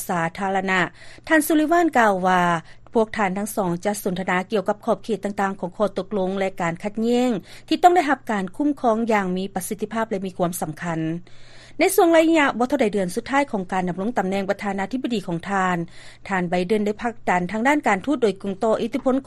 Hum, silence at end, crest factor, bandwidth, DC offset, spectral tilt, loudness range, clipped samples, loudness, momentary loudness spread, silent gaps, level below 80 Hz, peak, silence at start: none; 0.05 s; 20 dB; 13 kHz; under 0.1%; -5.5 dB/octave; 4 LU; under 0.1%; -22 LUFS; 9 LU; none; -50 dBFS; -2 dBFS; 0 s